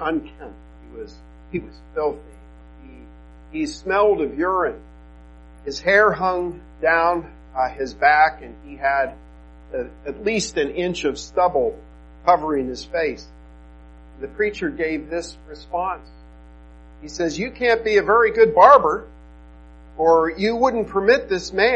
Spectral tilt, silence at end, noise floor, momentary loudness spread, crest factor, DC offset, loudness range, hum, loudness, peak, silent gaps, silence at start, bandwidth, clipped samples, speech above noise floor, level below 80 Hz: -4.5 dB/octave; 0 s; -44 dBFS; 21 LU; 22 dB; under 0.1%; 11 LU; none; -20 LUFS; 0 dBFS; none; 0 s; 9.2 kHz; under 0.1%; 24 dB; -44 dBFS